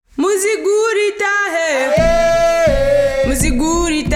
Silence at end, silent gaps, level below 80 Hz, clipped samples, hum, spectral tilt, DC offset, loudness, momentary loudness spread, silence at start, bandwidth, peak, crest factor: 0 s; none; -26 dBFS; under 0.1%; none; -4 dB/octave; under 0.1%; -14 LUFS; 3 LU; 0.15 s; 16.5 kHz; -2 dBFS; 12 dB